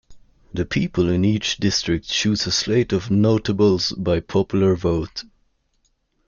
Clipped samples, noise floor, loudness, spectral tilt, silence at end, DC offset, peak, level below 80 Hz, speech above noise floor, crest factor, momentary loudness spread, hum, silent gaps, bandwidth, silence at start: under 0.1%; -67 dBFS; -20 LUFS; -5 dB/octave; 1.05 s; under 0.1%; -6 dBFS; -44 dBFS; 47 dB; 14 dB; 6 LU; none; none; 7.2 kHz; 0.1 s